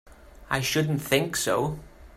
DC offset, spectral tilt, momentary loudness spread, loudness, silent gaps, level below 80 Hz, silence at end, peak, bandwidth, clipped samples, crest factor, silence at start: under 0.1%; -4 dB/octave; 7 LU; -26 LUFS; none; -50 dBFS; 0 s; -6 dBFS; 16 kHz; under 0.1%; 20 dB; 0.1 s